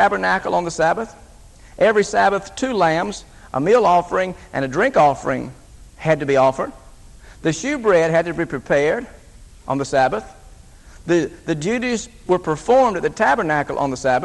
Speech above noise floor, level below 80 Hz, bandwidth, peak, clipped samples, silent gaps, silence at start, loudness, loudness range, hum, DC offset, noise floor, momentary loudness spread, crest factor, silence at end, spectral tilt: 25 dB; -46 dBFS; 12 kHz; -2 dBFS; under 0.1%; none; 0 s; -19 LUFS; 4 LU; none; under 0.1%; -43 dBFS; 11 LU; 18 dB; 0 s; -5 dB/octave